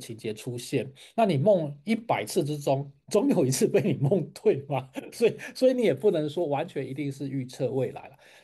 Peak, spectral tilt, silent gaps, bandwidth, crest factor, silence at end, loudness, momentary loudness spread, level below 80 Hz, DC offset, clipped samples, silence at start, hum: -10 dBFS; -6 dB/octave; none; 12.5 kHz; 16 dB; 0.35 s; -27 LUFS; 10 LU; -72 dBFS; under 0.1%; under 0.1%; 0 s; none